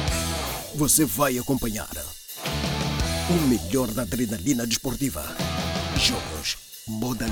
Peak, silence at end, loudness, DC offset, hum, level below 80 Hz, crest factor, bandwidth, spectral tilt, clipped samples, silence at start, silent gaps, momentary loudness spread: -6 dBFS; 0 s; -25 LUFS; under 0.1%; none; -38 dBFS; 18 dB; over 20 kHz; -3.5 dB/octave; under 0.1%; 0 s; none; 10 LU